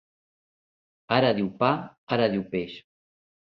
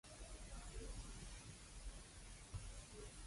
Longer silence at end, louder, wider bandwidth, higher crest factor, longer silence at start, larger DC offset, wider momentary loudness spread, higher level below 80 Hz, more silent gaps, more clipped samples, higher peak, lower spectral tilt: first, 0.75 s vs 0 s; first, -26 LUFS vs -56 LUFS; second, 6 kHz vs 11.5 kHz; first, 22 dB vs 16 dB; first, 1.1 s vs 0.05 s; neither; first, 10 LU vs 4 LU; second, -62 dBFS vs -56 dBFS; first, 1.98-2.07 s vs none; neither; first, -6 dBFS vs -38 dBFS; first, -8.5 dB/octave vs -3.5 dB/octave